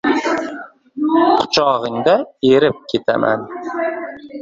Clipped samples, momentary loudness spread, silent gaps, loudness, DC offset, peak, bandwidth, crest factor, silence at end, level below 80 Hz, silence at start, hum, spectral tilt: under 0.1%; 14 LU; none; -16 LUFS; under 0.1%; 0 dBFS; 7.8 kHz; 16 dB; 0 s; -56 dBFS; 0.05 s; none; -5 dB/octave